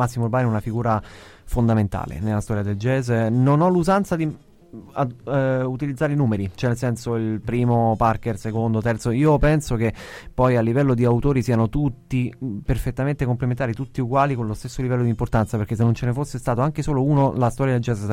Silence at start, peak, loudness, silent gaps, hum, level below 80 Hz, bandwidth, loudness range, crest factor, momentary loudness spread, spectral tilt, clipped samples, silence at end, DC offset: 0 s; -6 dBFS; -22 LUFS; none; none; -36 dBFS; 14.5 kHz; 3 LU; 14 dB; 8 LU; -8 dB/octave; under 0.1%; 0 s; under 0.1%